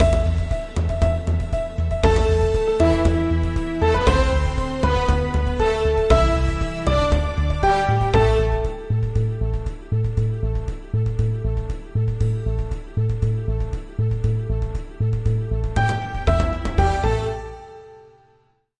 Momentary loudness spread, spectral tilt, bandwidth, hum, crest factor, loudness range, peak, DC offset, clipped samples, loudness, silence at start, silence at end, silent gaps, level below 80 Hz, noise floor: 9 LU; -7 dB/octave; 10.5 kHz; none; 18 dB; 5 LU; -2 dBFS; under 0.1%; under 0.1%; -21 LUFS; 0 s; 0.8 s; none; -26 dBFS; -60 dBFS